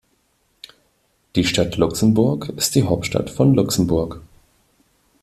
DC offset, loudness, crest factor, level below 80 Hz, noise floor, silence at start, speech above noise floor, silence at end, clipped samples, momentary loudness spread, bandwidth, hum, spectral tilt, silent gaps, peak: under 0.1%; -19 LUFS; 18 dB; -44 dBFS; -64 dBFS; 1.35 s; 46 dB; 1 s; under 0.1%; 7 LU; 15 kHz; none; -5.5 dB/octave; none; -2 dBFS